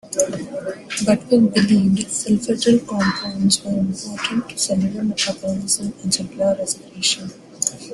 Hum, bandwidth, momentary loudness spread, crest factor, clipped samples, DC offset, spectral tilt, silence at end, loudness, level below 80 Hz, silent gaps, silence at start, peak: none; 12.5 kHz; 9 LU; 18 dB; under 0.1%; under 0.1%; -4 dB/octave; 0 s; -20 LUFS; -54 dBFS; none; 0.05 s; -2 dBFS